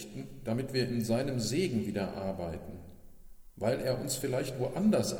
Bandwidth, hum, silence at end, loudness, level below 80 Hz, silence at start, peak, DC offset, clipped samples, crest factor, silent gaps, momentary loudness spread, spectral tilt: 18.5 kHz; none; 0 s; -33 LUFS; -54 dBFS; 0 s; -16 dBFS; under 0.1%; under 0.1%; 16 dB; none; 11 LU; -5.5 dB/octave